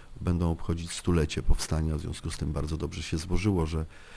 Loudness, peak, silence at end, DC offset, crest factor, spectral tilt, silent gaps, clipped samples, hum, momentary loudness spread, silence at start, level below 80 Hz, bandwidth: -31 LUFS; -10 dBFS; 0 s; under 0.1%; 18 dB; -6 dB/octave; none; under 0.1%; none; 6 LU; 0 s; -34 dBFS; 11 kHz